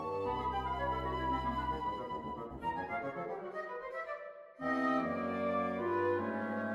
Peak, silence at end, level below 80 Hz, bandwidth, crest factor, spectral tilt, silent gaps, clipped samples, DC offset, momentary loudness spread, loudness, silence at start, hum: -20 dBFS; 0 s; -52 dBFS; 12.5 kHz; 16 dB; -7.5 dB/octave; none; under 0.1%; under 0.1%; 9 LU; -37 LUFS; 0 s; none